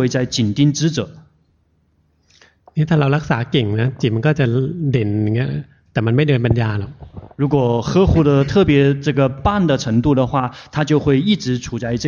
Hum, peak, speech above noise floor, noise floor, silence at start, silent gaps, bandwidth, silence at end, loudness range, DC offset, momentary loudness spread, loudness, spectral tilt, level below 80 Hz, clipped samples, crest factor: none; -2 dBFS; 44 dB; -60 dBFS; 0 s; none; 7.2 kHz; 0 s; 5 LU; under 0.1%; 10 LU; -17 LUFS; -6.5 dB/octave; -36 dBFS; under 0.1%; 14 dB